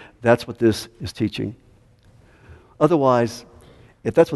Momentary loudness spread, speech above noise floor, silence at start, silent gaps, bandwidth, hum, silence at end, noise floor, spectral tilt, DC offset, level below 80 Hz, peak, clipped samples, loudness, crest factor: 13 LU; 34 dB; 0.25 s; none; 12 kHz; none; 0 s; -53 dBFS; -6.5 dB/octave; under 0.1%; -52 dBFS; 0 dBFS; under 0.1%; -21 LUFS; 20 dB